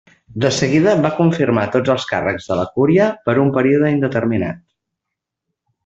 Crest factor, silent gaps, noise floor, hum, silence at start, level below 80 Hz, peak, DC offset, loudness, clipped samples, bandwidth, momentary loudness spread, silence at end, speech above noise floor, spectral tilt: 16 dB; none; -81 dBFS; none; 0.3 s; -52 dBFS; -2 dBFS; under 0.1%; -16 LUFS; under 0.1%; 8.2 kHz; 7 LU; 1.25 s; 65 dB; -6.5 dB/octave